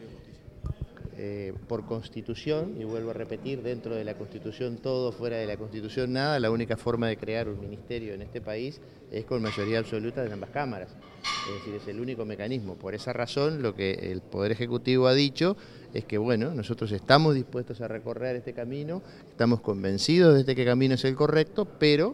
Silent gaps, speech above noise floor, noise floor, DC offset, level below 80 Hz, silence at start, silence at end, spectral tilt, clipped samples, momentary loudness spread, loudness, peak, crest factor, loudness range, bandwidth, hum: none; 20 dB; -48 dBFS; under 0.1%; -56 dBFS; 0 s; 0 s; -6.5 dB/octave; under 0.1%; 15 LU; -28 LUFS; -2 dBFS; 26 dB; 9 LU; 11.5 kHz; none